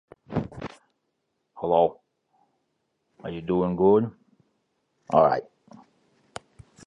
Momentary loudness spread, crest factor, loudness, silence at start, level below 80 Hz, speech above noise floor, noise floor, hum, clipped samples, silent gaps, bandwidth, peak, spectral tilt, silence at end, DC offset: 22 LU; 24 dB; -24 LUFS; 0.3 s; -58 dBFS; 55 dB; -77 dBFS; none; under 0.1%; none; 10.5 kHz; -4 dBFS; -8 dB/octave; 1.45 s; under 0.1%